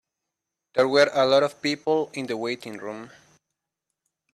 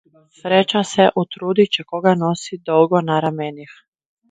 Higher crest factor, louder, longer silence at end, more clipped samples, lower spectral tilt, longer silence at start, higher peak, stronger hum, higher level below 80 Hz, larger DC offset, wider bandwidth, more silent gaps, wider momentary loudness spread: about the same, 20 dB vs 18 dB; second, -23 LUFS vs -17 LUFS; first, 1.25 s vs 0.65 s; neither; second, -4 dB/octave vs -5.5 dB/octave; first, 0.75 s vs 0.45 s; second, -6 dBFS vs 0 dBFS; neither; second, -72 dBFS vs -64 dBFS; neither; first, 13 kHz vs 9.6 kHz; neither; first, 16 LU vs 11 LU